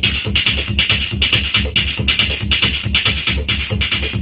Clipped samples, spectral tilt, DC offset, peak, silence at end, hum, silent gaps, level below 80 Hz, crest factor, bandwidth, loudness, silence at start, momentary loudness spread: under 0.1%; -6.5 dB/octave; under 0.1%; 0 dBFS; 0 s; none; none; -26 dBFS; 16 dB; 5.4 kHz; -15 LUFS; 0 s; 3 LU